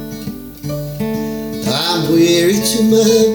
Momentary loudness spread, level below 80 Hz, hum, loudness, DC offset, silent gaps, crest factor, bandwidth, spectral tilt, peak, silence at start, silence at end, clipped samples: 15 LU; -42 dBFS; none; -14 LUFS; under 0.1%; none; 14 dB; over 20 kHz; -4.5 dB/octave; -2 dBFS; 0 s; 0 s; under 0.1%